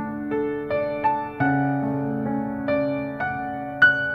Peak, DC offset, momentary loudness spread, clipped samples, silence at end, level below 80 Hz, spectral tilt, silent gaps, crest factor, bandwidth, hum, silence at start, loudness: -4 dBFS; under 0.1%; 9 LU; under 0.1%; 0 s; -54 dBFS; -8 dB/octave; none; 18 dB; 5.2 kHz; none; 0 s; -24 LUFS